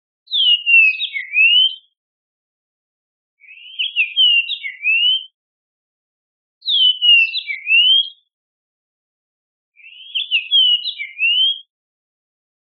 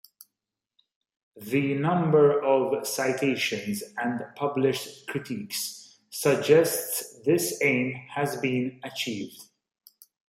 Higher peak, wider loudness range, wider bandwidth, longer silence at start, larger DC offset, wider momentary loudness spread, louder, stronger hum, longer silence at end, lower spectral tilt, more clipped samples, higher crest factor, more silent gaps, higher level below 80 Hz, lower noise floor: first, -2 dBFS vs -6 dBFS; about the same, 4 LU vs 4 LU; second, 4.8 kHz vs 16 kHz; second, 0.3 s vs 1.35 s; neither; about the same, 13 LU vs 13 LU; first, -13 LUFS vs -26 LUFS; neither; first, 1.1 s vs 0.9 s; second, 18.5 dB/octave vs -4.5 dB/octave; neither; about the same, 16 dB vs 20 dB; first, 1.97-3.37 s, 5.34-6.61 s, 8.33-9.72 s vs none; second, under -90 dBFS vs -72 dBFS; about the same, under -90 dBFS vs -87 dBFS